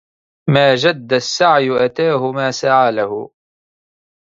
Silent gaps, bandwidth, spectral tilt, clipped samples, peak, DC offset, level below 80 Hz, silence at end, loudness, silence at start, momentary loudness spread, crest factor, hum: none; 7.8 kHz; -5 dB/octave; under 0.1%; 0 dBFS; under 0.1%; -60 dBFS; 1.05 s; -15 LUFS; 0.45 s; 10 LU; 16 dB; none